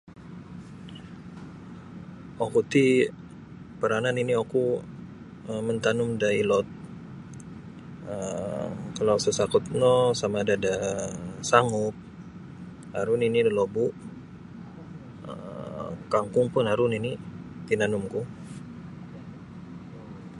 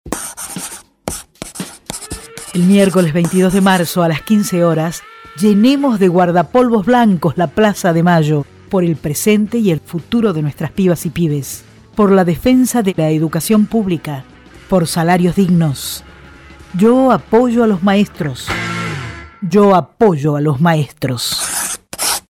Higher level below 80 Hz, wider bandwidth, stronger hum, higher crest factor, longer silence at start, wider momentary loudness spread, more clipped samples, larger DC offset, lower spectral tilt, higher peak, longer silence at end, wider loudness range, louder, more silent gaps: second, -58 dBFS vs -42 dBFS; second, 11.5 kHz vs 17.5 kHz; neither; first, 24 dB vs 14 dB; about the same, 0.05 s vs 0.05 s; first, 21 LU vs 14 LU; neither; neither; about the same, -5.5 dB/octave vs -5.5 dB/octave; second, -4 dBFS vs 0 dBFS; second, 0 s vs 0.15 s; about the same, 4 LU vs 3 LU; second, -26 LUFS vs -14 LUFS; neither